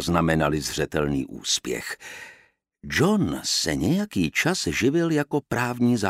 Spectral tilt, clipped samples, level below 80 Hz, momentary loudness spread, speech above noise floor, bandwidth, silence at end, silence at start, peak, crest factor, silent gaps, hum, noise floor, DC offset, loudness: -4.5 dB/octave; under 0.1%; -46 dBFS; 9 LU; 32 dB; 16 kHz; 0 s; 0 s; -4 dBFS; 20 dB; none; none; -56 dBFS; under 0.1%; -24 LUFS